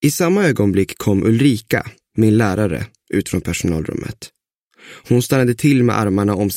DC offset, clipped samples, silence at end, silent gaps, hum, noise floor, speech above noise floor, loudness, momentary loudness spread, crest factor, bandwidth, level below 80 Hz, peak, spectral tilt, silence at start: under 0.1%; under 0.1%; 0 s; 4.57-4.71 s; none; -57 dBFS; 41 dB; -17 LUFS; 10 LU; 16 dB; 16.5 kHz; -44 dBFS; -2 dBFS; -6 dB/octave; 0 s